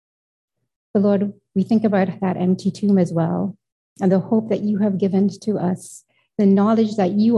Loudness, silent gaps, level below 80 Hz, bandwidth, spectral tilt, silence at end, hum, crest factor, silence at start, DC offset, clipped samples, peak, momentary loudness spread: -20 LUFS; 3.72-3.96 s; -62 dBFS; 11.5 kHz; -8.5 dB/octave; 0 s; none; 14 dB; 0.95 s; under 0.1%; under 0.1%; -6 dBFS; 7 LU